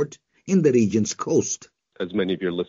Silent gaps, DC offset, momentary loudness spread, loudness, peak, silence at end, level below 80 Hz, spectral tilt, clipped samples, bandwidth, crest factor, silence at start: none; under 0.1%; 13 LU; -22 LUFS; -8 dBFS; 0.05 s; -62 dBFS; -5.5 dB/octave; under 0.1%; 7.6 kHz; 16 dB; 0 s